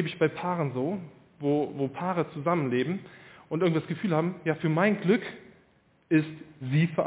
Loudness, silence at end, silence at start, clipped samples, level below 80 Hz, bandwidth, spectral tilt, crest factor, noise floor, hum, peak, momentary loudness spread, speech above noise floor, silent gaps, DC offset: -28 LUFS; 0 s; 0 s; under 0.1%; -68 dBFS; 4 kHz; -6.5 dB/octave; 18 dB; -64 dBFS; none; -10 dBFS; 13 LU; 36 dB; none; under 0.1%